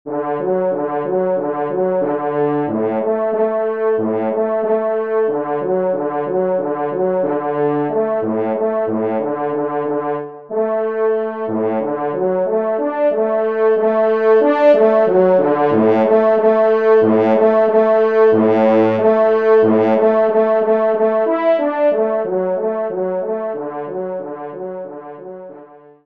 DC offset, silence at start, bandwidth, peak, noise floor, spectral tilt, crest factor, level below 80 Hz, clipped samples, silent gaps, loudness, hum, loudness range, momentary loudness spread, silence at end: 0.2%; 0.05 s; 5 kHz; -2 dBFS; -41 dBFS; -9 dB/octave; 14 dB; -68 dBFS; under 0.1%; none; -16 LUFS; none; 7 LU; 9 LU; 0.3 s